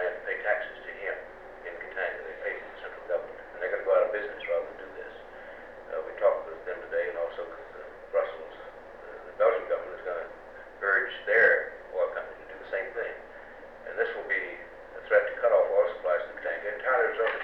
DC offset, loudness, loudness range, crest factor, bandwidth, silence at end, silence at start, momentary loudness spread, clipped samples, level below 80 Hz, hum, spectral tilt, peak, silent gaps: 0.1%; -29 LUFS; 6 LU; 20 dB; 5.6 kHz; 0 s; 0 s; 19 LU; under 0.1%; -62 dBFS; 60 Hz at -70 dBFS; -5 dB/octave; -10 dBFS; none